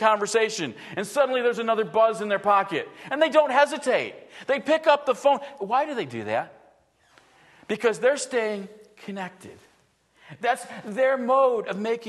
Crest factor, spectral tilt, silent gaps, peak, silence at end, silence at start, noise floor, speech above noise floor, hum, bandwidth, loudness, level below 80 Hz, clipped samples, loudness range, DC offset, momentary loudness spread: 20 dB; -3.5 dB/octave; none; -4 dBFS; 0 s; 0 s; -63 dBFS; 40 dB; none; 12.5 kHz; -24 LUFS; -76 dBFS; under 0.1%; 6 LU; under 0.1%; 14 LU